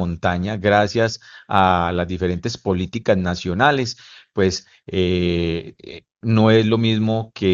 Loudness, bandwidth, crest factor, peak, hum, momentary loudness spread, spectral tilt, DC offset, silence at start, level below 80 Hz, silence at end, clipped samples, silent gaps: -19 LUFS; 7.6 kHz; 18 dB; 0 dBFS; none; 13 LU; -6 dB/octave; under 0.1%; 0 s; -48 dBFS; 0 s; under 0.1%; none